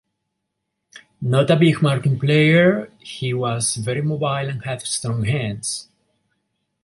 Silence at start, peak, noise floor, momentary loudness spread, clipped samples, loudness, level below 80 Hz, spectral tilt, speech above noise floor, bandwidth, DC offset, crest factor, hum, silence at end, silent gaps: 0.95 s; -2 dBFS; -77 dBFS; 12 LU; under 0.1%; -19 LUFS; -56 dBFS; -5.5 dB/octave; 59 dB; 11.5 kHz; under 0.1%; 18 dB; none; 1 s; none